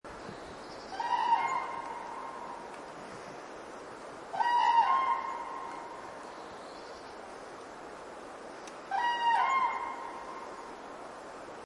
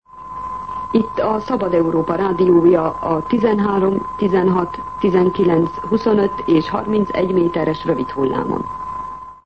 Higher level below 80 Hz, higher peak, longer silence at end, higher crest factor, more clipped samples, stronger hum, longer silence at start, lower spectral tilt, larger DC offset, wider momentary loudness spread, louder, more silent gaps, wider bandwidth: second, -70 dBFS vs -44 dBFS; second, -14 dBFS vs -2 dBFS; about the same, 0 s vs 0.1 s; first, 20 dB vs 14 dB; neither; neither; about the same, 0.05 s vs 0.15 s; second, -2.5 dB/octave vs -9 dB/octave; second, under 0.1% vs 0.4%; first, 18 LU vs 12 LU; second, -32 LUFS vs -17 LUFS; neither; first, 11.5 kHz vs 6.6 kHz